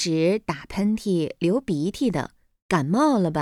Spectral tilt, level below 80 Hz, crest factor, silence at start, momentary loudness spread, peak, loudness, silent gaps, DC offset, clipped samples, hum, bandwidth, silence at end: -6 dB/octave; -52 dBFS; 18 dB; 0 s; 7 LU; -4 dBFS; -24 LUFS; 2.62-2.69 s; under 0.1%; under 0.1%; none; 14 kHz; 0 s